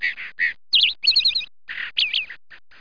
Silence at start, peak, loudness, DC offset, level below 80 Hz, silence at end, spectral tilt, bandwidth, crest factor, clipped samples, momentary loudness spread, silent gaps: 0 s; -8 dBFS; -19 LUFS; 0.7%; -62 dBFS; 0.25 s; 2 dB/octave; 5.4 kHz; 16 dB; under 0.1%; 14 LU; none